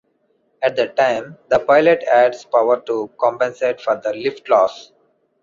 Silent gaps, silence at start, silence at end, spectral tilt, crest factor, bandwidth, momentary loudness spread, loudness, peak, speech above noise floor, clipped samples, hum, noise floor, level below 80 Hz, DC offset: none; 0.6 s; 0.6 s; -5 dB/octave; 16 dB; 7.4 kHz; 9 LU; -17 LUFS; -2 dBFS; 47 dB; under 0.1%; none; -64 dBFS; -60 dBFS; under 0.1%